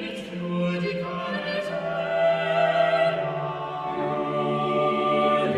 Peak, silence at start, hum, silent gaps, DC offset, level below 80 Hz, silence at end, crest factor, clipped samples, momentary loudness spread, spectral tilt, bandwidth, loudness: -10 dBFS; 0 s; none; none; under 0.1%; -62 dBFS; 0 s; 14 dB; under 0.1%; 9 LU; -6.5 dB/octave; 11 kHz; -25 LUFS